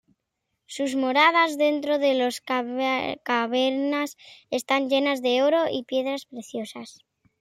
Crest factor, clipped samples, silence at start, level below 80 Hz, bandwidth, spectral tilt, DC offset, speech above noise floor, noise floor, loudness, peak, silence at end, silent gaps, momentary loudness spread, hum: 18 dB; under 0.1%; 0.7 s; -76 dBFS; 15 kHz; -3 dB/octave; under 0.1%; 56 dB; -80 dBFS; -24 LUFS; -6 dBFS; 0.5 s; none; 15 LU; none